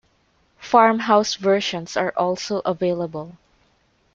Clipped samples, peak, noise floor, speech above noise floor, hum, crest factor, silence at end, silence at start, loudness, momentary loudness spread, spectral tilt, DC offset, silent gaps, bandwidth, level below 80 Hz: under 0.1%; -2 dBFS; -63 dBFS; 43 dB; none; 20 dB; 0.85 s; 0.6 s; -20 LUFS; 15 LU; -4.5 dB/octave; under 0.1%; none; 7.8 kHz; -62 dBFS